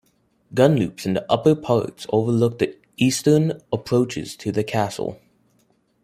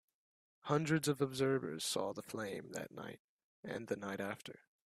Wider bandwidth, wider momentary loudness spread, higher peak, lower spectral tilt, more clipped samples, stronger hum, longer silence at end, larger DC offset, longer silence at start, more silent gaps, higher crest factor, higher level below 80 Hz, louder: about the same, 16 kHz vs 15.5 kHz; second, 9 LU vs 17 LU; first, -2 dBFS vs -18 dBFS; first, -6 dB/octave vs -4.5 dB/octave; neither; neither; first, 0.9 s vs 0.35 s; neither; second, 0.5 s vs 0.65 s; second, none vs 3.19-3.63 s; about the same, 20 dB vs 22 dB; first, -58 dBFS vs -78 dBFS; first, -21 LUFS vs -39 LUFS